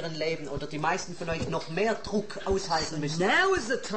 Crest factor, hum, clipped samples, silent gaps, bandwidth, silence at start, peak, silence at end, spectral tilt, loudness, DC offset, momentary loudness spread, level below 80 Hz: 16 dB; none; under 0.1%; none; 8.8 kHz; 0 s; -14 dBFS; 0 s; -4 dB/octave; -29 LUFS; 0.8%; 9 LU; -48 dBFS